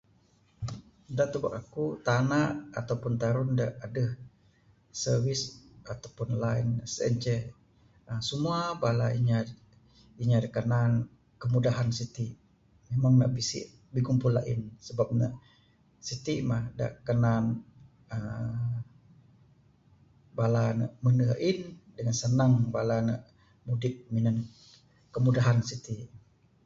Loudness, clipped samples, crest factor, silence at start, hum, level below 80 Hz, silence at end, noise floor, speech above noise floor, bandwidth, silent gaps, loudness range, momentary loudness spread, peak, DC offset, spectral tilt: -30 LUFS; under 0.1%; 18 dB; 0.6 s; none; -58 dBFS; 0.5 s; -65 dBFS; 37 dB; 7.8 kHz; none; 4 LU; 15 LU; -12 dBFS; under 0.1%; -6.5 dB/octave